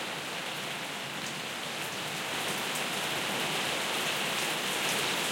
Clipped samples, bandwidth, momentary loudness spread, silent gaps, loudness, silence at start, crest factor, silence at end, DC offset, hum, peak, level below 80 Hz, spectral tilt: under 0.1%; 16.5 kHz; 6 LU; none; -31 LUFS; 0 s; 16 dB; 0 s; under 0.1%; none; -18 dBFS; -76 dBFS; -1.5 dB/octave